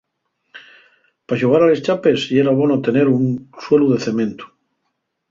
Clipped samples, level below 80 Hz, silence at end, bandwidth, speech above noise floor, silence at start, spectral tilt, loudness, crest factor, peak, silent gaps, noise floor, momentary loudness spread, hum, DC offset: under 0.1%; -60 dBFS; 0.85 s; 7.6 kHz; 57 dB; 0.55 s; -7 dB/octave; -16 LUFS; 16 dB; -2 dBFS; none; -73 dBFS; 10 LU; none; under 0.1%